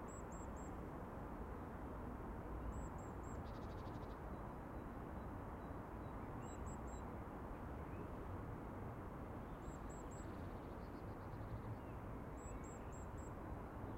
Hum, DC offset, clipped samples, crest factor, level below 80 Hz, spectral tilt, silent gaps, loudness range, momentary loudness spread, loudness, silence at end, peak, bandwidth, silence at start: none; under 0.1%; under 0.1%; 14 dB; -56 dBFS; -7 dB/octave; none; 1 LU; 1 LU; -51 LUFS; 0 s; -36 dBFS; 16 kHz; 0 s